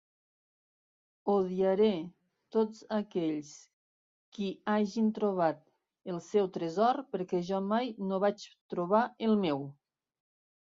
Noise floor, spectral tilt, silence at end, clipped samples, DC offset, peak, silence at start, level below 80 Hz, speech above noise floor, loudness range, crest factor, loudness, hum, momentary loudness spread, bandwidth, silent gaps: under -90 dBFS; -7 dB/octave; 0.9 s; under 0.1%; under 0.1%; -14 dBFS; 1.25 s; -76 dBFS; over 59 dB; 3 LU; 18 dB; -32 LUFS; none; 12 LU; 7.6 kHz; 3.73-4.32 s, 8.61-8.69 s